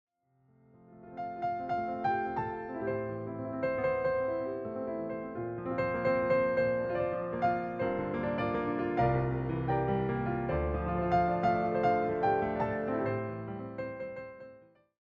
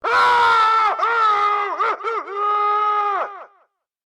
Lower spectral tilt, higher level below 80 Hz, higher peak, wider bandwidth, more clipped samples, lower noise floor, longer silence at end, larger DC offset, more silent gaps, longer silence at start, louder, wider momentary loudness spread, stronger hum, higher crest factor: first, -9.5 dB/octave vs -1.5 dB/octave; first, -52 dBFS vs -64 dBFS; second, -16 dBFS vs -10 dBFS; second, 7 kHz vs 11.5 kHz; neither; first, -69 dBFS vs -62 dBFS; second, 0.45 s vs 0.6 s; neither; neither; first, 0.9 s vs 0.05 s; second, -32 LUFS vs -17 LUFS; about the same, 11 LU vs 10 LU; neither; first, 16 dB vs 10 dB